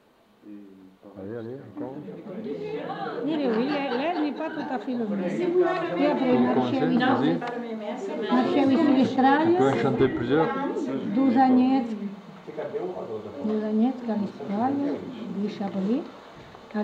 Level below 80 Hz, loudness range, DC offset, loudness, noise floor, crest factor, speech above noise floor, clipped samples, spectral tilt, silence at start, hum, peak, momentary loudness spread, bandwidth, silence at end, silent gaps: -64 dBFS; 7 LU; under 0.1%; -25 LUFS; -52 dBFS; 16 dB; 28 dB; under 0.1%; -7.5 dB/octave; 0.45 s; none; -8 dBFS; 16 LU; 7.8 kHz; 0 s; none